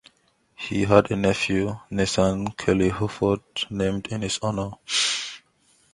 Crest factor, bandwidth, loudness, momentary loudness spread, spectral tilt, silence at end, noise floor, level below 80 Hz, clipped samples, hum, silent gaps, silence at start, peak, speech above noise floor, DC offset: 24 dB; 11.5 kHz; -24 LUFS; 10 LU; -4.5 dB/octave; 0.55 s; -64 dBFS; -46 dBFS; under 0.1%; none; none; 0.6 s; 0 dBFS; 41 dB; under 0.1%